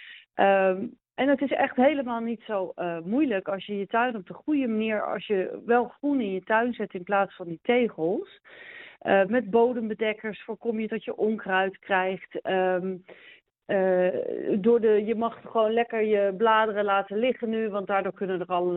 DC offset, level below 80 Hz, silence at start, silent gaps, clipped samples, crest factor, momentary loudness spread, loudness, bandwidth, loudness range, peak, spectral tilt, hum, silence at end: under 0.1%; -70 dBFS; 0 s; none; under 0.1%; 18 dB; 10 LU; -26 LUFS; 4.1 kHz; 4 LU; -8 dBFS; -4 dB/octave; none; 0 s